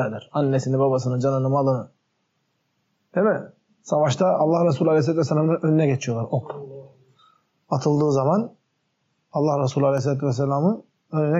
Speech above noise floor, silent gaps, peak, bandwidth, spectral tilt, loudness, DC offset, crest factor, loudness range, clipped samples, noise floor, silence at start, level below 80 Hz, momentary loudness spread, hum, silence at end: 51 dB; none; -10 dBFS; 8 kHz; -7.5 dB/octave; -22 LUFS; under 0.1%; 14 dB; 4 LU; under 0.1%; -72 dBFS; 0 s; -70 dBFS; 9 LU; none; 0 s